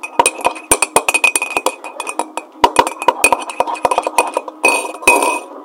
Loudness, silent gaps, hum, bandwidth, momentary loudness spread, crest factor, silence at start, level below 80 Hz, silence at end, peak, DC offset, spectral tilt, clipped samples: -14 LUFS; none; none; over 20 kHz; 10 LU; 16 dB; 0.05 s; -48 dBFS; 0 s; 0 dBFS; under 0.1%; -0.5 dB/octave; 0.4%